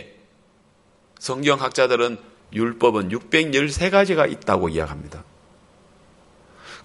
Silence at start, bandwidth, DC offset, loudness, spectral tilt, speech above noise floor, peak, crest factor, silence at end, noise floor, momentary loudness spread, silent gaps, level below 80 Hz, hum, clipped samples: 0 s; 11.5 kHz; under 0.1%; -20 LUFS; -4.5 dB/octave; 37 dB; -2 dBFS; 22 dB; 0.05 s; -58 dBFS; 17 LU; none; -46 dBFS; none; under 0.1%